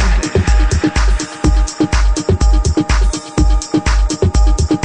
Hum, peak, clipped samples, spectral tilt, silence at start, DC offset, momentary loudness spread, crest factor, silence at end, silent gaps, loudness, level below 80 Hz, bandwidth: none; -2 dBFS; under 0.1%; -5.5 dB/octave; 0 s; under 0.1%; 3 LU; 10 dB; 0 s; none; -15 LUFS; -14 dBFS; 10 kHz